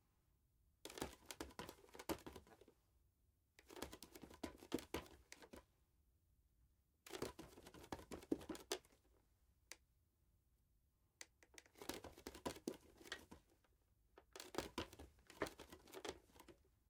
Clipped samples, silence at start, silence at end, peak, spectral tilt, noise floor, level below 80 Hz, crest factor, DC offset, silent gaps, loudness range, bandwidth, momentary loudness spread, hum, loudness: under 0.1%; 0.65 s; 0.3 s; -26 dBFS; -3.5 dB/octave; -81 dBFS; -72 dBFS; 30 dB; under 0.1%; none; 4 LU; 17 kHz; 15 LU; none; -54 LUFS